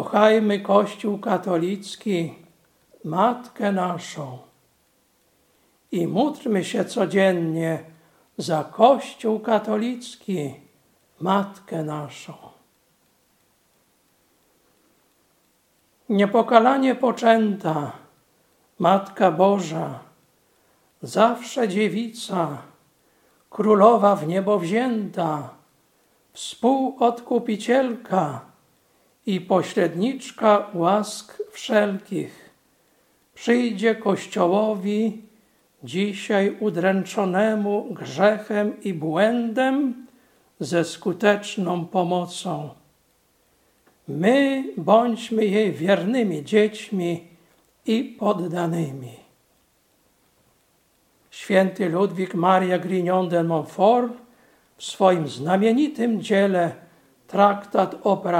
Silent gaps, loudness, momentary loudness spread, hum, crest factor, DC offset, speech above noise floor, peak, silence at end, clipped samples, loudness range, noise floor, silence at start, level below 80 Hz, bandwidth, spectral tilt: none; -22 LUFS; 13 LU; none; 22 dB; under 0.1%; 43 dB; 0 dBFS; 0 s; under 0.1%; 7 LU; -64 dBFS; 0 s; -74 dBFS; 15.5 kHz; -6 dB/octave